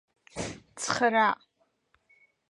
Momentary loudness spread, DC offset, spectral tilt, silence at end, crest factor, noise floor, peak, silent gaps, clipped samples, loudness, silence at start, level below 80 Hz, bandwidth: 15 LU; under 0.1%; -3 dB/octave; 1.15 s; 22 dB; -73 dBFS; -10 dBFS; none; under 0.1%; -28 LUFS; 0.35 s; -62 dBFS; 11.5 kHz